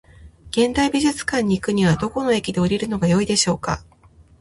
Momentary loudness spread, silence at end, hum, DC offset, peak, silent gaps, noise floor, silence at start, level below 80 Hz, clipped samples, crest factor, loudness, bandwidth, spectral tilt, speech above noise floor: 5 LU; 0.6 s; none; under 0.1%; -4 dBFS; none; -39 dBFS; 0.2 s; -44 dBFS; under 0.1%; 18 dB; -20 LUFS; 11.5 kHz; -5 dB/octave; 20 dB